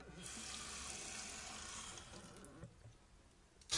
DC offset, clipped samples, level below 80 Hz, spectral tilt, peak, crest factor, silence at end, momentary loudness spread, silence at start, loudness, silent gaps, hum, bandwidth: under 0.1%; under 0.1%; -66 dBFS; -1 dB/octave; -24 dBFS; 26 dB; 0 s; 19 LU; 0 s; -49 LUFS; none; none; 12 kHz